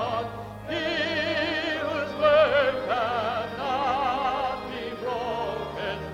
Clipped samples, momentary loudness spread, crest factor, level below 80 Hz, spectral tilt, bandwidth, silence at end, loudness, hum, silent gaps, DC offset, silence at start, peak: under 0.1%; 11 LU; 18 dB; -52 dBFS; -5 dB/octave; 15 kHz; 0 s; -26 LUFS; none; none; under 0.1%; 0 s; -8 dBFS